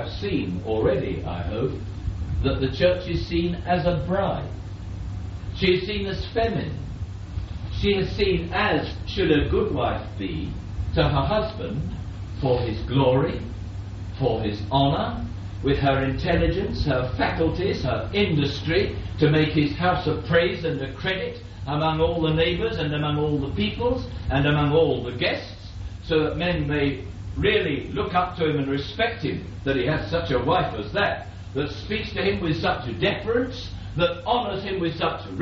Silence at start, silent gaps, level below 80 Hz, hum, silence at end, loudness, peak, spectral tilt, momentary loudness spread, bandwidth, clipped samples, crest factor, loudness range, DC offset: 0 s; none; -36 dBFS; none; 0 s; -24 LUFS; -6 dBFS; -5 dB/octave; 11 LU; 7.6 kHz; under 0.1%; 18 dB; 3 LU; under 0.1%